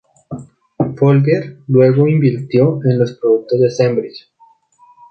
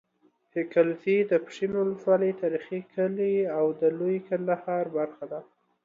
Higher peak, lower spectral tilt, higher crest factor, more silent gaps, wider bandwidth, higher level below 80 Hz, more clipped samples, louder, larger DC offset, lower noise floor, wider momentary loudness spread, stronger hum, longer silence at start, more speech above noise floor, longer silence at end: first, 0 dBFS vs -10 dBFS; about the same, -9 dB/octave vs -8 dB/octave; about the same, 14 dB vs 18 dB; neither; second, 6.6 kHz vs 7.4 kHz; first, -56 dBFS vs -74 dBFS; neither; first, -14 LUFS vs -27 LUFS; neither; second, -51 dBFS vs -67 dBFS; first, 19 LU vs 9 LU; neither; second, 0.3 s vs 0.55 s; about the same, 38 dB vs 41 dB; first, 0.9 s vs 0.4 s